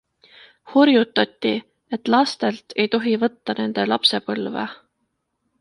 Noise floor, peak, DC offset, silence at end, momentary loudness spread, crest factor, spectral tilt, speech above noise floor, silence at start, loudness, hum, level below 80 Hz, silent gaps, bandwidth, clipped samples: -74 dBFS; -2 dBFS; under 0.1%; 0.85 s; 12 LU; 20 dB; -5 dB/octave; 54 dB; 0.65 s; -20 LUFS; none; -68 dBFS; none; 11.5 kHz; under 0.1%